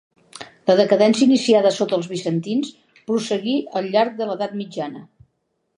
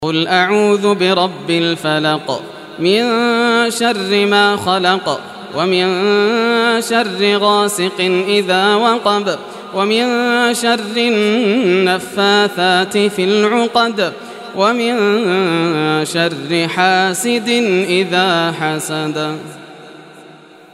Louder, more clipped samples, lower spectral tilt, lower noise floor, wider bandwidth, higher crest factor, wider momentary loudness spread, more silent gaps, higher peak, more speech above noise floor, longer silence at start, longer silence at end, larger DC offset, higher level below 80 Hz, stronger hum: second, -19 LUFS vs -14 LUFS; neither; first, -5.5 dB/octave vs -4 dB/octave; first, -72 dBFS vs -40 dBFS; second, 11 kHz vs 14 kHz; about the same, 18 dB vs 14 dB; first, 17 LU vs 7 LU; neither; about the same, -2 dBFS vs 0 dBFS; first, 53 dB vs 26 dB; first, 0.35 s vs 0 s; first, 0.75 s vs 0.35 s; neither; second, -70 dBFS vs -64 dBFS; neither